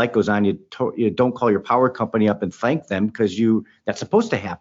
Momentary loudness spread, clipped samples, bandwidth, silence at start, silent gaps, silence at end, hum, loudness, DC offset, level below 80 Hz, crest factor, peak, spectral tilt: 6 LU; under 0.1%; 7.8 kHz; 0 s; none; 0.05 s; none; -21 LUFS; under 0.1%; -60 dBFS; 16 dB; -4 dBFS; -6 dB/octave